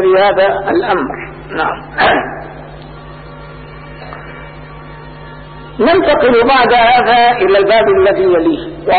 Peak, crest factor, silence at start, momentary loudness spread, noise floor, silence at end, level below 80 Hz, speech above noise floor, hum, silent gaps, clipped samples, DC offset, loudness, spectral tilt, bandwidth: 0 dBFS; 12 dB; 0 s; 23 LU; -31 dBFS; 0 s; -38 dBFS; 20 dB; none; none; under 0.1%; 0.3%; -10 LUFS; -10.5 dB/octave; 4.8 kHz